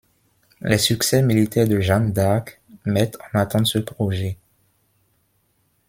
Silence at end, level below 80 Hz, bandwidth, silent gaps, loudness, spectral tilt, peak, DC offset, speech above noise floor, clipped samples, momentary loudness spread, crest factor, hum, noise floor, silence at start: 1.55 s; -52 dBFS; 16.5 kHz; none; -20 LUFS; -5 dB/octave; -2 dBFS; under 0.1%; 46 dB; under 0.1%; 12 LU; 20 dB; none; -66 dBFS; 0.65 s